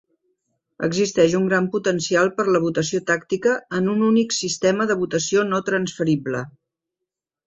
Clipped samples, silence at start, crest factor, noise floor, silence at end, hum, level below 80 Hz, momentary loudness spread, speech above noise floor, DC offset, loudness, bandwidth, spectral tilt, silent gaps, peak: under 0.1%; 0.8 s; 18 dB; -85 dBFS; 1 s; none; -60 dBFS; 6 LU; 65 dB; under 0.1%; -21 LUFS; 8.4 kHz; -4.5 dB/octave; none; -4 dBFS